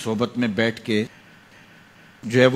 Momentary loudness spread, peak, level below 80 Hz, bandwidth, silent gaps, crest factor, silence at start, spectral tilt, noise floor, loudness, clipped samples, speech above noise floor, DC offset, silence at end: 10 LU; -2 dBFS; -62 dBFS; 14 kHz; none; 22 dB; 0 s; -6 dB/octave; -50 dBFS; -23 LUFS; under 0.1%; 29 dB; under 0.1%; 0 s